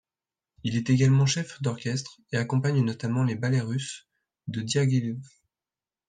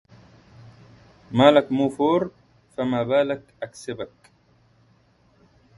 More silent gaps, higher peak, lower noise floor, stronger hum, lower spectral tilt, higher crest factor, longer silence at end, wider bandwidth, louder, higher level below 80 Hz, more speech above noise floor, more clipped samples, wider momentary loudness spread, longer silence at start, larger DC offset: neither; second, -10 dBFS vs -2 dBFS; first, under -90 dBFS vs -60 dBFS; neither; about the same, -6 dB/octave vs -6.5 dB/octave; second, 16 dB vs 22 dB; second, 0.8 s vs 1.7 s; second, 9.4 kHz vs 11.5 kHz; second, -26 LUFS vs -22 LUFS; about the same, -62 dBFS vs -62 dBFS; first, over 65 dB vs 39 dB; neither; second, 14 LU vs 19 LU; second, 0.65 s vs 1.3 s; neither